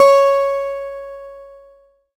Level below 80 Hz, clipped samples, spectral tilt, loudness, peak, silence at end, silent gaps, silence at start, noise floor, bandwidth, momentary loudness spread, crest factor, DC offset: -56 dBFS; under 0.1%; -1 dB/octave; -16 LUFS; 0 dBFS; 0.75 s; none; 0 s; -51 dBFS; 15 kHz; 23 LU; 16 dB; under 0.1%